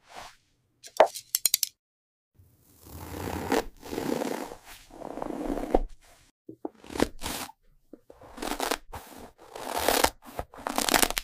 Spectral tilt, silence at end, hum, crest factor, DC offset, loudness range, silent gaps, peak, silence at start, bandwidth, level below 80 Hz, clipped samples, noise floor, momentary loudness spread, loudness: -2 dB/octave; 0 s; none; 26 dB; under 0.1%; 6 LU; 1.79-2.32 s, 6.31-6.45 s; -4 dBFS; 0.1 s; 16 kHz; -44 dBFS; under 0.1%; -66 dBFS; 22 LU; -29 LUFS